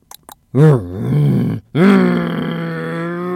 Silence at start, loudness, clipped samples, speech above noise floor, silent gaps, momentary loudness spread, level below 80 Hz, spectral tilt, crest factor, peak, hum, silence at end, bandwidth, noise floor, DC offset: 0.55 s; -15 LUFS; under 0.1%; 30 dB; none; 11 LU; -50 dBFS; -8.5 dB/octave; 14 dB; 0 dBFS; none; 0 s; 13 kHz; -41 dBFS; under 0.1%